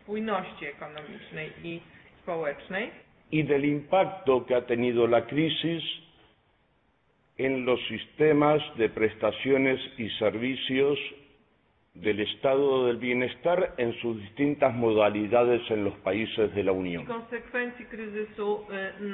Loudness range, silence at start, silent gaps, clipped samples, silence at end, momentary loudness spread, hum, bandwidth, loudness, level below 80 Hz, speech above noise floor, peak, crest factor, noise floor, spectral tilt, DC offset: 4 LU; 0.1 s; none; under 0.1%; 0 s; 14 LU; none; 4.1 kHz; -27 LUFS; -62 dBFS; 41 dB; -8 dBFS; 20 dB; -68 dBFS; -10 dB/octave; under 0.1%